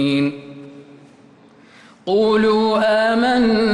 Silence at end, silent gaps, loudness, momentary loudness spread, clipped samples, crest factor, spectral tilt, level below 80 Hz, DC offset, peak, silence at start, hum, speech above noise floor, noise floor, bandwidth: 0 s; none; -16 LUFS; 20 LU; under 0.1%; 10 dB; -6 dB/octave; -52 dBFS; under 0.1%; -8 dBFS; 0 s; none; 32 dB; -48 dBFS; 11 kHz